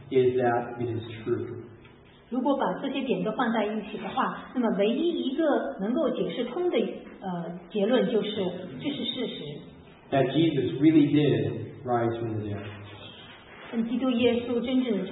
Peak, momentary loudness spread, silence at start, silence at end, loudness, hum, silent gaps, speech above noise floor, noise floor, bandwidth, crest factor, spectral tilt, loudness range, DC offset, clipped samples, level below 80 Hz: -10 dBFS; 14 LU; 0 s; 0 s; -27 LUFS; none; none; 26 dB; -52 dBFS; 4.1 kHz; 18 dB; -11 dB/octave; 4 LU; under 0.1%; under 0.1%; -64 dBFS